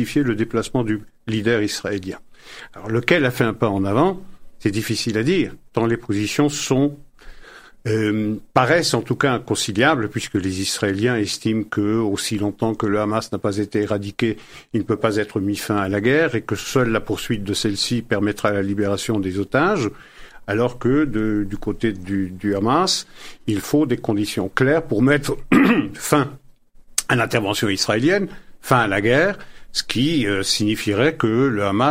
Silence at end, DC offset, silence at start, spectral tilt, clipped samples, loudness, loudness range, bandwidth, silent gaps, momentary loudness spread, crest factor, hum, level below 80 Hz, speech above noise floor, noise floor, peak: 0 s; under 0.1%; 0 s; -5 dB/octave; under 0.1%; -20 LUFS; 3 LU; 16 kHz; none; 8 LU; 20 dB; none; -46 dBFS; 26 dB; -46 dBFS; 0 dBFS